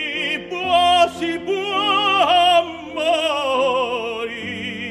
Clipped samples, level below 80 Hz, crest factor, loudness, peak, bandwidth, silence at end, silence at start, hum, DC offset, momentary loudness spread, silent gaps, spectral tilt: under 0.1%; -56 dBFS; 16 dB; -18 LUFS; -4 dBFS; 12.5 kHz; 0 s; 0 s; none; under 0.1%; 12 LU; none; -3 dB/octave